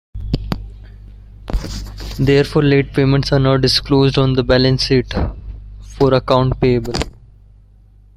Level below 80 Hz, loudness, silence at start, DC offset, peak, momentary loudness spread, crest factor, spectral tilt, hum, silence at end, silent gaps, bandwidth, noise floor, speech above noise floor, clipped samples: -28 dBFS; -15 LUFS; 0.15 s; under 0.1%; -2 dBFS; 16 LU; 16 dB; -6.5 dB/octave; 50 Hz at -30 dBFS; 1.1 s; none; 13 kHz; -45 dBFS; 32 dB; under 0.1%